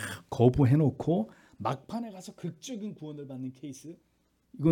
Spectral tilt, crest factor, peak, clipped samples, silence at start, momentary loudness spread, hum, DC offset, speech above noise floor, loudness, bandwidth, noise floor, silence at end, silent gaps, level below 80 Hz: -8 dB/octave; 22 dB; -8 dBFS; under 0.1%; 0 s; 19 LU; none; under 0.1%; 29 dB; -30 LUFS; 17.5 kHz; -58 dBFS; 0 s; none; -54 dBFS